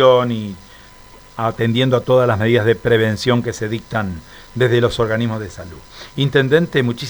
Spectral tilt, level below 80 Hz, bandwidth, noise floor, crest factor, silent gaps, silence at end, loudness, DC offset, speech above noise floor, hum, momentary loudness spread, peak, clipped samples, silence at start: -6.5 dB/octave; -44 dBFS; over 20 kHz; -42 dBFS; 16 dB; none; 0 s; -17 LUFS; under 0.1%; 25 dB; none; 17 LU; 0 dBFS; under 0.1%; 0 s